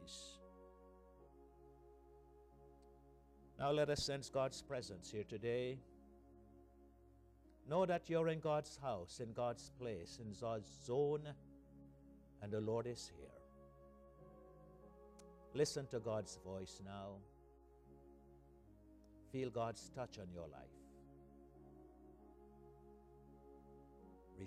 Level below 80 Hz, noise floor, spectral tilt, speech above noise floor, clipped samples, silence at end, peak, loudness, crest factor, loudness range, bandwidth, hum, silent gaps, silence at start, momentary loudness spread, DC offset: -68 dBFS; -67 dBFS; -5 dB/octave; 23 dB; under 0.1%; 0 s; -26 dBFS; -44 LUFS; 22 dB; 14 LU; 14.5 kHz; 60 Hz at -70 dBFS; none; 0 s; 26 LU; under 0.1%